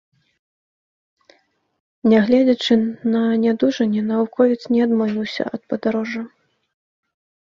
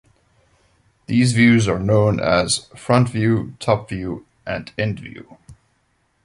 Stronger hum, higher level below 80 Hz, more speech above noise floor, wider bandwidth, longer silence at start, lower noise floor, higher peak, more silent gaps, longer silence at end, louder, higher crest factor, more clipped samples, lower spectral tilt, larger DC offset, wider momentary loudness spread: neither; second, -64 dBFS vs -44 dBFS; second, 42 dB vs 47 dB; second, 7.2 kHz vs 11.5 kHz; first, 2.05 s vs 1.1 s; second, -60 dBFS vs -65 dBFS; about the same, -2 dBFS vs -2 dBFS; neither; first, 1.2 s vs 0.7 s; about the same, -19 LUFS vs -19 LUFS; about the same, 18 dB vs 18 dB; neither; about the same, -6.5 dB/octave vs -5.5 dB/octave; neither; second, 9 LU vs 15 LU